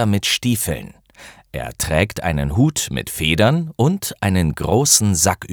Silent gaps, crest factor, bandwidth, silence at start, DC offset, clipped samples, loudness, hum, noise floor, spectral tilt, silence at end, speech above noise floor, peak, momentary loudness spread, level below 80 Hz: none; 18 dB; over 20 kHz; 0 s; under 0.1%; under 0.1%; -17 LUFS; none; -44 dBFS; -4 dB/octave; 0 s; 26 dB; 0 dBFS; 11 LU; -36 dBFS